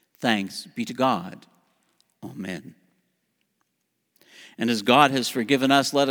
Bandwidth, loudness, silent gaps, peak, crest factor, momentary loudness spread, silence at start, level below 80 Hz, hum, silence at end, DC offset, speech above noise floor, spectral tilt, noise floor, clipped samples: over 20 kHz; -22 LUFS; none; -2 dBFS; 24 dB; 19 LU; 0.2 s; -74 dBFS; none; 0 s; under 0.1%; 53 dB; -4 dB/octave; -76 dBFS; under 0.1%